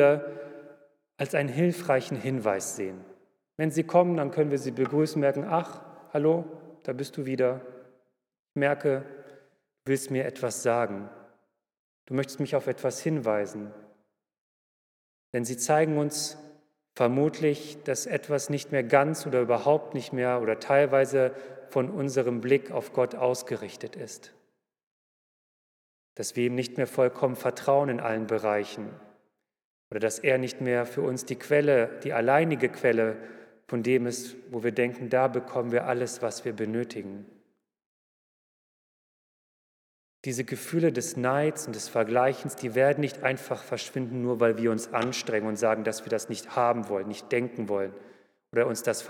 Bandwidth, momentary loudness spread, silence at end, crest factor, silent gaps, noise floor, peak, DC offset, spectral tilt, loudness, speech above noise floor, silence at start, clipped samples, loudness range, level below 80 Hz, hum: 17.5 kHz; 13 LU; 0 s; 22 dB; 8.39-8.45 s, 11.79-12.07 s, 14.41-15.33 s, 24.83-26.16 s, 29.65-29.91 s, 37.86-40.24 s; -73 dBFS; -6 dBFS; under 0.1%; -5.5 dB/octave; -28 LUFS; 46 dB; 0 s; under 0.1%; 7 LU; -84 dBFS; none